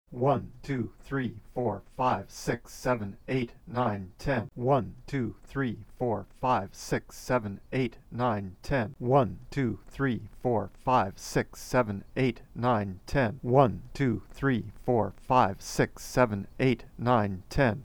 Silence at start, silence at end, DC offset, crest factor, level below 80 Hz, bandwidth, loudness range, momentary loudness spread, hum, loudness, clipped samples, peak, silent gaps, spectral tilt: 0.1 s; 0 s; under 0.1%; 22 dB; -48 dBFS; 18.5 kHz; 4 LU; 8 LU; none; -30 LUFS; under 0.1%; -8 dBFS; none; -6.5 dB/octave